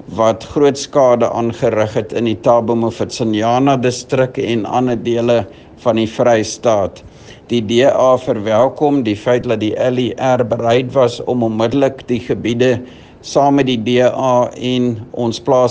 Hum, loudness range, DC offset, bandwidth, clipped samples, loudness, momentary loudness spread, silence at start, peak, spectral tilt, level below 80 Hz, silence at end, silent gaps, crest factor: none; 1 LU; under 0.1%; 9.6 kHz; under 0.1%; -15 LUFS; 6 LU; 0.1 s; 0 dBFS; -6 dB/octave; -50 dBFS; 0 s; none; 14 dB